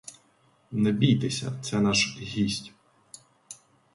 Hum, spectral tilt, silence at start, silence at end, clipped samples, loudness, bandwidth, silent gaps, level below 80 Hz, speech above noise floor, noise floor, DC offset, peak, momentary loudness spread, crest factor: none; -4.5 dB/octave; 0.05 s; 0.4 s; under 0.1%; -26 LUFS; 11.5 kHz; none; -58 dBFS; 38 dB; -64 dBFS; under 0.1%; -10 dBFS; 23 LU; 18 dB